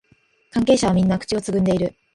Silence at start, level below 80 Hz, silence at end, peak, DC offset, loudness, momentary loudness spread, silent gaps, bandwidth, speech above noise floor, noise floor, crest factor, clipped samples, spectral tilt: 0.55 s; -46 dBFS; 0.25 s; -4 dBFS; under 0.1%; -20 LUFS; 6 LU; none; 11.5 kHz; 41 dB; -60 dBFS; 16 dB; under 0.1%; -6 dB/octave